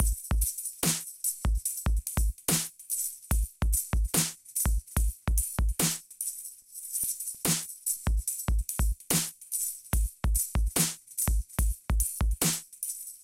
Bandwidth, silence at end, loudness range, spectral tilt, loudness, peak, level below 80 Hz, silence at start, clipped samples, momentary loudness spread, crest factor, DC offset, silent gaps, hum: 17 kHz; 0.05 s; 1 LU; -3 dB/octave; -30 LUFS; -10 dBFS; -32 dBFS; 0 s; under 0.1%; 5 LU; 20 dB; under 0.1%; none; none